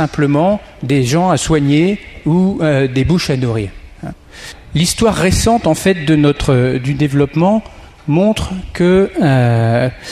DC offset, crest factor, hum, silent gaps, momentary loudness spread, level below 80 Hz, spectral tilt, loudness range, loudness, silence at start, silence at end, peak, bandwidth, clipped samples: under 0.1%; 12 dB; none; none; 10 LU; -32 dBFS; -6 dB/octave; 2 LU; -14 LUFS; 0 s; 0 s; -2 dBFS; 15 kHz; under 0.1%